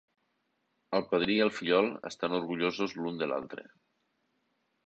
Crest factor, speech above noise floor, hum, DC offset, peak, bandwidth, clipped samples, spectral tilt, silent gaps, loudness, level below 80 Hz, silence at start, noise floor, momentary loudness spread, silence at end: 20 dB; 47 dB; none; under 0.1%; -12 dBFS; 8.2 kHz; under 0.1%; -5.5 dB/octave; none; -31 LUFS; -70 dBFS; 0.9 s; -78 dBFS; 9 LU; 1.25 s